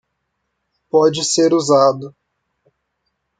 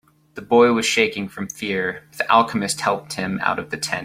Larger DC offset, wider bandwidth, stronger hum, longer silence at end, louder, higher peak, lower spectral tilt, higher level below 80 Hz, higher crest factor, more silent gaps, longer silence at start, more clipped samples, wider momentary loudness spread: neither; second, 9.4 kHz vs 16 kHz; neither; first, 1.3 s vs 0 s; first, -15 LUFS vs -20 LUFS; about the same, -2 dBFS vs -2 dBFS; about the same, -4 dB/octave vs -3.5 dB/octave; second, -64 dBFS vs -58 dBFS; about the same, 16 dB vs 20 dB; neither; first, 0.95 s vs 0.35 s; neither; about the same, 12 LU vs 12 LU